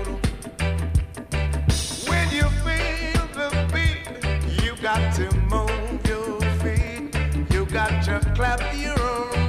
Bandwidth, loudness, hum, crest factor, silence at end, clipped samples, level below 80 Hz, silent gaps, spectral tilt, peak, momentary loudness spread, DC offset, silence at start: 15 kHz; -24 LUFS; none; 16 dB; 0 s; under 0.1%; -26 dBFS; none; -5 dB/octave; -6 dBFS; 4 LU; under 0.1%; 0 s